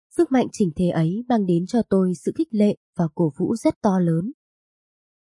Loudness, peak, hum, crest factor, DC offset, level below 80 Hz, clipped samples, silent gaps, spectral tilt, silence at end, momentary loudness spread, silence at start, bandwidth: -22 LUFS; -6 dBFS; none; 16 dB; under 0.1%; -56 dBFS; under 0.1%; 2.77-2.93 s, 3.76-3.81 s; -8 dB/octave; 1 s; 5 LU; 0.15 s; 11.5 kHz